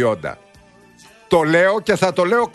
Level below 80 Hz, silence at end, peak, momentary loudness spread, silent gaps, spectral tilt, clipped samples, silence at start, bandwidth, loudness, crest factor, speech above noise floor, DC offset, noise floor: -52 dBFS; 0.05 s; -2 dBFS; 9 LU; none; -5.5 dB/octave; under 0.1%; 0 s; 12 kHz; -17 LUFS; 16 dB; 32 dB; under 0.1%; -48 dBFS